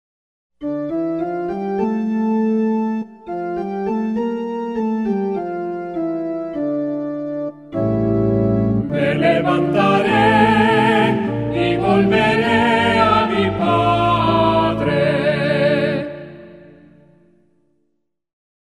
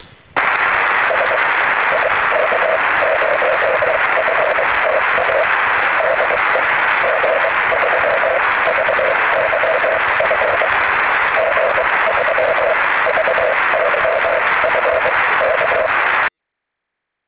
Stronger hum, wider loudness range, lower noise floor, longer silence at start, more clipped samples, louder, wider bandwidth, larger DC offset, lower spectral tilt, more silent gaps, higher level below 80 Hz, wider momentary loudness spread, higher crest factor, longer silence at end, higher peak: neither; first, 8 LU vs 0 LU; second, -71 dBFS vs -78 dBFS; first, 0.6 s vs 0.35 s; neither; second, -18 LUFS vs -14 LUFS; first, 11 kHz vs 4 kHz; second, under 0.1% vs 0.1%; first, -7.5 dB/octave vs -6 dB/octave; neither; about the same, -44 dBFS vs -48 dBFS; first, 11 LU vs 1 LU; about the same, 16 dB vs 14 dB; first, 2.1 s vs 1 s; about the same, -2 dBFS vs -2 dBFS